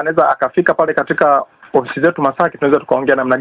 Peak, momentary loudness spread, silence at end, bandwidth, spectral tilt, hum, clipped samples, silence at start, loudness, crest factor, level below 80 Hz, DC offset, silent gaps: 0 dBFS; 4 LU; 0 s; 4 kHz; -10 dB/octave; none; under 0.1%; 0 s; -14 LUFS; 14 dB; -54 dBFS; under 0.1%; none